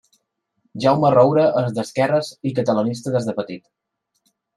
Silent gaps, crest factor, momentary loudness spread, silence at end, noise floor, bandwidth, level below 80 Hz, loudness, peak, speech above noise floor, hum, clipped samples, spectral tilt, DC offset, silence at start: none; 18 dB; 14 LU; 1 s; -71 dBFS; 12.5 kHz; -62 dBFS; -19 LUFS; -2 dBFS; 53 dB; none; under 0.1%; -7 dB/octave; under 0.1%; 0.75 s